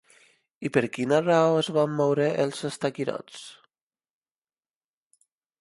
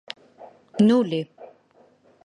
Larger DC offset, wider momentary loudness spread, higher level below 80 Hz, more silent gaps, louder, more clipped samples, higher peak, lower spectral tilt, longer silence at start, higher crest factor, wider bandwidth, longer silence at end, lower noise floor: neither; second, 16 LU vs 21 LU; about the same, -72 dBFS vs -70 dBFS; neither; second, -25 LUFS vs -21 LUFS; neither; about the same, -6 dBFS vs -6 dBFS; second, -5.5 dB/octave vs -7.5 dB/octave; first, 0.6 s vs 0.4 s; about the same, 20 dB vs 18 dB; first, 11.5 kHz vs 10 kHz; first, 2.05 s vs 0.8 s; first, under -90 dBFS vs -58 dBFS